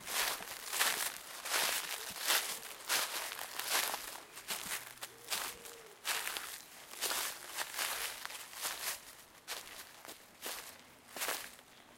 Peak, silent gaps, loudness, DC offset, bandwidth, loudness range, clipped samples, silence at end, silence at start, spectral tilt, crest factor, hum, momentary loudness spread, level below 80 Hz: -16 dBFS; none; -37 LUFS; under 0.1%; 17 kHz; 8 LU; under 0.1%; 0 s; 0 s; 1.5 dB/octave; 26 dB; none; 17 LU; -74 dBFS